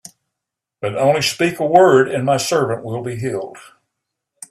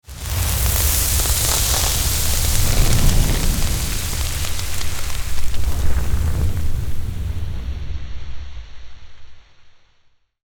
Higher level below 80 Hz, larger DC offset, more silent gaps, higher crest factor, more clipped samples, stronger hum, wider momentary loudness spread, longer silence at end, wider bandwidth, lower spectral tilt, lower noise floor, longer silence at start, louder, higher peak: second, -58 dBFS vs -22 dBFS; neither; neither; about the same, 18 dB vs 16 dB; neither; neither; about the same, 14 LU vs 14 LU; first, 0.9 s vs 0.75 s; second, 14 kHz vs over 20 kHz; first, -4.5 dB/octave vs -3 dB/octave; first, -82 dBFS vs -56 dBFS; first, 0.8 s vs 0.1 s; first, -17 LUFS vs -20 LUFS; about the same, 0 dBFS vs -2 dBFS